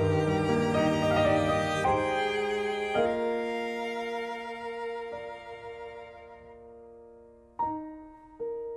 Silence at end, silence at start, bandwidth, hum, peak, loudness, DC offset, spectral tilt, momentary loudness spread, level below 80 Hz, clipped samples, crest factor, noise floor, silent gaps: 0 s; 0 s; 14 kHz; none; -14 dBFS; -29 LUFS; under 0.1%; -6 dB/octave; 22 LU; -56 dBFS; under 0.1%; 18 dB; -54 dBFS; none